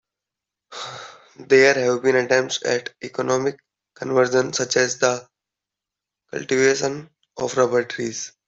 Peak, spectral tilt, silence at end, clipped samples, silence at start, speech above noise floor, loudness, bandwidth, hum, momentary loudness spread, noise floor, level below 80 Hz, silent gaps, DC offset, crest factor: -2 dBFS; -3.5 dB/octave; 0.2 s; under 0.1%; 0.7 s; 66 dB; -20 LUFS; 8 kHz; none; 17 LU; -87 dBFS; -66 dBFS; none; under 0.1%; 20 dB